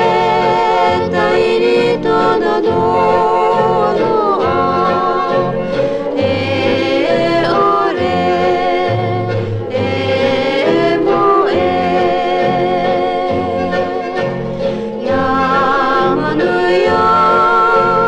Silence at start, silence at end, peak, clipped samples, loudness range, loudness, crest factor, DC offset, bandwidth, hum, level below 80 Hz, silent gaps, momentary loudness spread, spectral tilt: 0 s; 0 s; 0 dBFS; under 0.1%; 3 LU; -13 LUFS; 12 dB; under 0.1%; 10 kHz; none; -42 dBFS; none; 6 LU; -6.5 dB/octave